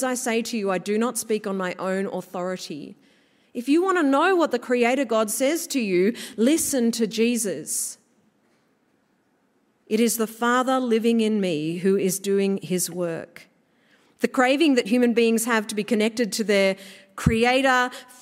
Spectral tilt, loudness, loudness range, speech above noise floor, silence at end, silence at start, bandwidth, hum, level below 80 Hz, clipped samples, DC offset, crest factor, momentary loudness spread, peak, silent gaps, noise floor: -4 dB/octave; -22 LUFS; 5 LU; 44 dB; 0.2 s; 0 s; 16 kHz; none; -52 dBFS; under 0.1%; under 0.1%; 20 dB; 10 LU; -4 dBFS; none; -66 dBFS